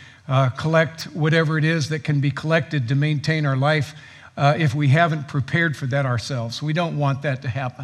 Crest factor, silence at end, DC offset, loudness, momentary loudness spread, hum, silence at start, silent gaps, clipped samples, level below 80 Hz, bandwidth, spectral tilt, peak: 18 dB; 0 s; under 0.1%; -21 LUFS; 7 LU; none; 0 s; none; under 0.1%; -62 dBFS; 11 kHz; -6.5 dB/octave; -2 dBFS